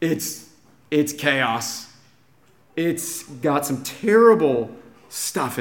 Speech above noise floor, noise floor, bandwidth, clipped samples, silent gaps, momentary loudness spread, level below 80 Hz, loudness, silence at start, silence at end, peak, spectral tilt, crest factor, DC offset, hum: 37 dB; -58 dBFS; 17 kHz; under 0.1%; none; 17 LU; -68 dBFS; -21 LUFS; 0 s; 0 s; -2 dBFS; -4 dB/octave; 20 dB; 0.1%; none